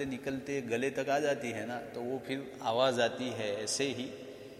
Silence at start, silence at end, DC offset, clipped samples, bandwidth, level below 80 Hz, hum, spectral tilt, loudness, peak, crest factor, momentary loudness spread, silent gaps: 0 s; 0 s; under 0.1%; under 0.1%; 15.5 kHz; -70 dBFS; none; -3.5 dB/octave; -34 LUFS; -16 dBFS; 18 dB; 10 LU; none